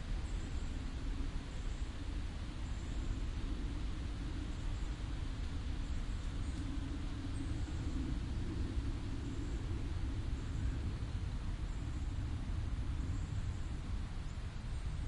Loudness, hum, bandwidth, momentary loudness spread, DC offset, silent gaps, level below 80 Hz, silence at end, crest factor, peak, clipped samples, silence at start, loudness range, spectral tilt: -43 LUFS; none; 11 kHz; 3 LU; under 0.1%; none; -40 dBFS; 0 s; 12 dB; -26 dBFS; under 0.1%; 0 s; 2 LU; -6.5 dB/octave